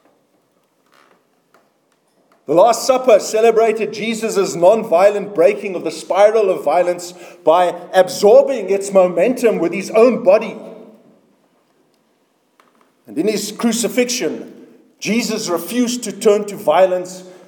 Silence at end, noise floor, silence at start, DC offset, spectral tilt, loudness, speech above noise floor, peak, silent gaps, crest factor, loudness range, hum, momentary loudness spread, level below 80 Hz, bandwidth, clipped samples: 0.15 s; -61 dBFS; 2.5 s; under 0.1%; -4 dB/octave; -15 LUFS; 46 dB; 0 dBFS; none; 16 dB; 8 LU; none; 11 LU; -70 dBFS; 19 kHz; under 0.1%